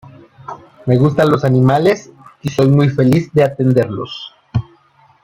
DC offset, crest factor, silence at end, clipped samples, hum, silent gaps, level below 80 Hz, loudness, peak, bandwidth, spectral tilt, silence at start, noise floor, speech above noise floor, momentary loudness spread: under 0.1%; 14 dB; 0.6 s; under 0.1%; none; none; -46 dBFS; -14 LUFS; -2 dBFS; 13.5 kHz; -8 dB/octave; 0.05 s; -51 dBFS; 38 dB; 15 LU